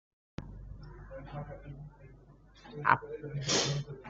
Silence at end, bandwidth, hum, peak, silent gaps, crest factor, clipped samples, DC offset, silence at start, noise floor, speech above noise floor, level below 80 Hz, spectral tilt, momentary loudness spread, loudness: 0 s; 8.2 kHz; none; -8 dBFS; none; 30 dB; under 0.1%; under 0.1%; 0.4 s; -58 dBFS; 23 dB; -54 dBFS; -3 dB/octave; 20 LU; -32 LUFS